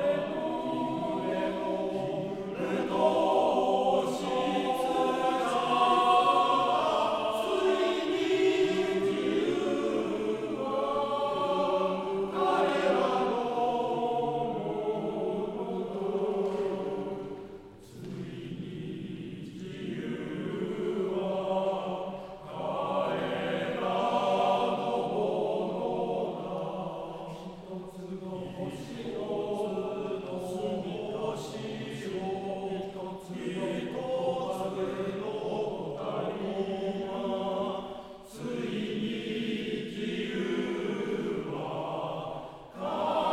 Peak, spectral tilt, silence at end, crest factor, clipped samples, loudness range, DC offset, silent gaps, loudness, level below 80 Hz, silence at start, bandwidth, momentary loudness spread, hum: -12 dBFS; -6 dB/octave; 0 s; 18 dB; under 0.1%; 9 LU; under 0.1%; none; -31 LUFS; -62 dBFS; 0 s; 14 kHz; 13 LU; none